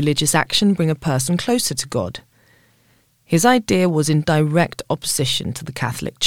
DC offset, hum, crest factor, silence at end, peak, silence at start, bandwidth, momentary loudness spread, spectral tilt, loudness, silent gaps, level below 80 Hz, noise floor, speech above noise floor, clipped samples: 0.5%; none; 18 dB; 0 s; -2 dBFS; 0 s; 17 kHz; 9 LU; -4.5 dB/octave; -18 LUFS; none; -48 dBFS; -58 dBFS; 40 dB; under 0.1%